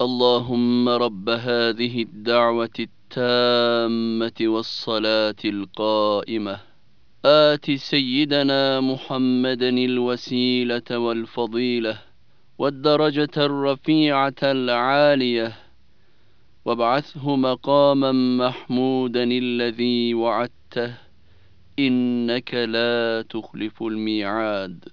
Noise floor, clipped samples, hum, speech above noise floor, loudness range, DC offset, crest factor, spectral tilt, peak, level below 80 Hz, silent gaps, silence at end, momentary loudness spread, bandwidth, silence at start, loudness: -61 dBFS; under 0.1%; none; 40 dB; 4 LU; 0.4%; 20 dB; -6.5 dB/octave; -2 dBFS; -66 dBFS; none; 0.15 s; 10 LU; 5.4 kHz; 0 s; -21 LUFS